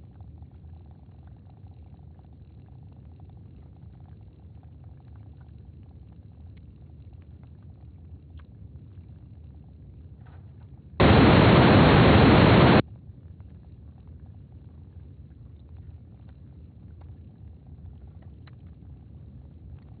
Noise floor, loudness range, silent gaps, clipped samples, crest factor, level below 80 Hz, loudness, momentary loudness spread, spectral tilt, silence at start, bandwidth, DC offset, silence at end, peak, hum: -48 dBFS; 8 LU; none; under 0.1%; 22 dB; -40 dBFS; -17 LUFS; 30 LU; -5.5 dB/octave; 11 s; 4.8 kHz; under 0.1%; 7.2 s; -4 dBFS; none